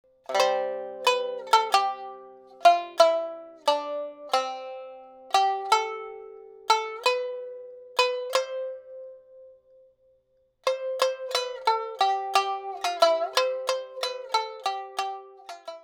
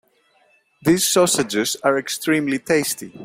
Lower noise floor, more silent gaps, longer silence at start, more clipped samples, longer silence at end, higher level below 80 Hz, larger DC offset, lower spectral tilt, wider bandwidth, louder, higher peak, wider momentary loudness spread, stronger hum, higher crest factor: first, -67 dBFS vs -60 dBFS; neither; second, 0.3 s vs 0.85 s; neither; about the same, 0.05 s vs 0 s; second, -82 dBFS vs -60 dBFS; neither; second, 0.5 dB/octave vs -3 dB/octave; first, 20 kHz vs 16.5 kHz; second, -26 LUFS vs -19 LUFS; about the same, -4 dBFS vs -4 dBFS; first, 19 LU vs 6 LU; neither; first, 22 dB vs 16 dB